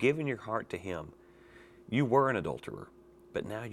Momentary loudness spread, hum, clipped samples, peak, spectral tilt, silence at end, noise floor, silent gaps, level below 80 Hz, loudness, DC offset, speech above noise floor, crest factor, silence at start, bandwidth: 19 LU; none; under 0.1%; -12 dBFS; -7 dB/octave; 0 s; -56 dBFS; none; -64 dBFS; -33 LUFS; under 0.1%; 24 dB; 20 dB; 0 s; 12.5 kHz